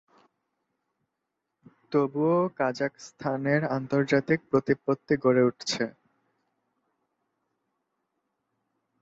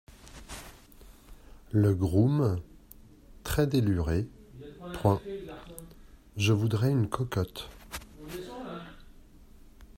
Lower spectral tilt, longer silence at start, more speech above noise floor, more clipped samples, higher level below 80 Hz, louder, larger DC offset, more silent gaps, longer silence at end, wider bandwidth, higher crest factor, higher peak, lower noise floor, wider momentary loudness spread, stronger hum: about the same, -6 dB/octave vs -7 dB/octave; first, 1.9 s vs 0.25 s; first, 57 dB vs 27 dB; neither; second, -68 dBFS vs -48 dBFS; about the same, -27 LUFS vs -29 LUFS; neither; neither; first, 3.1 s vs 0.05 s; second, 8 kHz vs 16 kHz; about the same, 20 dB vs 22 dB; about the same, -10 dBFS vs -10 dBFS; first, -83 dBFS vs -53 dBFS; second, 8 LU vs 21 LU; neither